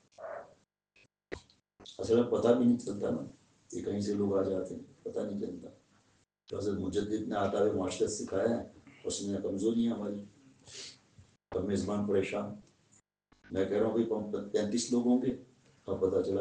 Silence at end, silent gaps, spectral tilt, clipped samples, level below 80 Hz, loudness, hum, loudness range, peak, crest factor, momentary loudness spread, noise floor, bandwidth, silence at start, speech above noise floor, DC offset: 0 s; none; -5.5 dB/octave; under 0.1%; -68 dBFS; -33 LUFS; none; 5 LU; -14 dBFS; 20 dB; 19 LU; -71 dBFS; 9.8 kHz; 0.2 s; 39 dB; under 0.1%